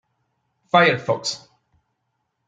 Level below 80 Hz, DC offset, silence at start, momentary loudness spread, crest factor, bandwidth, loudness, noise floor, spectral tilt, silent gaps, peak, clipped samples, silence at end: -68 dBFS; under 0.1%; 0.75 s; 13 LU; 22 dB; 9.4 kHz; -19 LUFS; -75 dBFS; -4 dB/octave; none; -2 dBFS; under 0.1%; 1.1 s